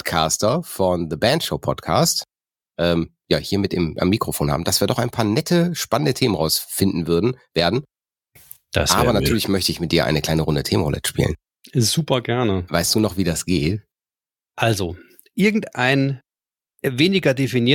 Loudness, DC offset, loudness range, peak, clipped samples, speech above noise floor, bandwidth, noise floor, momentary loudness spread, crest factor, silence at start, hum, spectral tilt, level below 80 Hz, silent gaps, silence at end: -20 LUFS; under 0.1%; 2 LU; -2 dBFS; under 0.1%; over 71 dB; 17.5 kHz; under -90 dBFS; 7 LU; 18 dB; 0.05 s; none; -4.5 dB/octave; -40 dBFS; none; 0 s